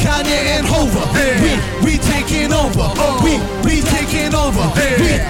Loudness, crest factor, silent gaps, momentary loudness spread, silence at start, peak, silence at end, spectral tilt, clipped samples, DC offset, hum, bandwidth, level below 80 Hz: -15 LUFS; 8 dB; none; 2 LU; 0 s; -6 dBFS; 0 s; -4.5 dB/octave; under 0.1%; under 0.1%; none; 17 kHz; -22 dBFS